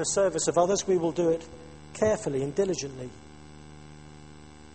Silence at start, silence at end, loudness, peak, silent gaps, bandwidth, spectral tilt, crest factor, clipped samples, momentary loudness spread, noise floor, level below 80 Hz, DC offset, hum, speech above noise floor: 0 s; 0 s; -27 LUFS; -10 dBFS; none; 8.8 kHz; -4.5 dB/octave; 18 dB; under 0.1%; 24 LU; -49 dBFS; -56 dBFS; 0.2%; 50 Hz at -55 dBFS; 22 dB